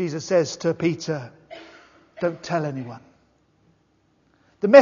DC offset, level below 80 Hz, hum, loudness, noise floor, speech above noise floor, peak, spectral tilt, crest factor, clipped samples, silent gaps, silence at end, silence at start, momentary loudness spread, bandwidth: under 0.1%; -68 dBFS; none; -24 LUFS; -64 dBFS; 39 dB; 0 dBFS; -5.5 dB/octave; 22 dB; under 0.1%; none; 0 s; 0 s; 21 LU; 7.4 kHz